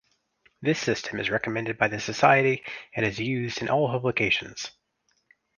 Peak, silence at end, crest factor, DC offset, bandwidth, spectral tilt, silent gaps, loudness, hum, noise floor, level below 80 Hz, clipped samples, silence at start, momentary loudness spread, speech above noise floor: -4 dBFS; 0.9 s; 22 dB; under 0.1%; 10 kHz; -5 dB/octave; none; -25 LUFS; none; -72 dBFS; -60 dBFS; under 0.1%; 0.6 s; 11 LU; 47 dB